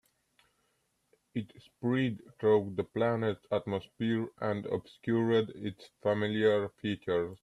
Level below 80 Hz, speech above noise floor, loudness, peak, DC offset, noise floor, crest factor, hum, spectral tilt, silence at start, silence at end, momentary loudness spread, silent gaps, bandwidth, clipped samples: -70 dBFS; 45 dB; -32 LUFS; -14 dBFS; under 0.1%; -76 dBFS; 18 dB; none; -8 dB/octave; 1.35 s; 0.05 s; 12 LU; none; 11 kHz; under 0.1%